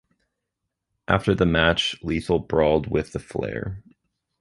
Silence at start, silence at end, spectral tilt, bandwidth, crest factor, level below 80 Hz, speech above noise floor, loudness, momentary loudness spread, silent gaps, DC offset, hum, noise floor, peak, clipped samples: 1.1 s; 0.6 s; -6 dB/octave; 11.5 kHz; 22 dB; -40 dBFS; 59 dB; -23 LUFS; 13 LU; none; under 0.1%; none; -82 dBFS; -2 dBFS; under 0.1%